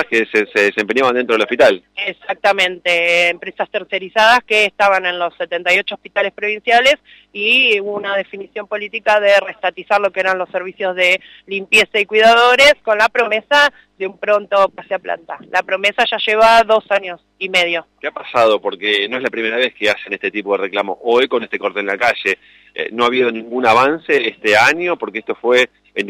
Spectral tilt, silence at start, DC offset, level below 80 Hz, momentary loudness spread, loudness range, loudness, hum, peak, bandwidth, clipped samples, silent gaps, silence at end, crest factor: -2.5 dB/octave; 0 s; under 0.1%; -56 dBFS; 12 LU; 5 LU; -14 LUFS; none; -2 dBFS; 16 kHz; under 0.1%; none; 0 s; 14 dB